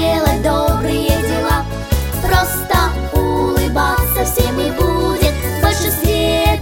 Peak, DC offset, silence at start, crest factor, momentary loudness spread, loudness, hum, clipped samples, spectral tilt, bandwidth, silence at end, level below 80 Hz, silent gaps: 0 dBFS; under 0.1%; 0 s; 14 dB; 3 LU; -16 LUFS; none; under 0.1%; -5 dB/octave; 17 kHz; 0 s; -20 dBFS; none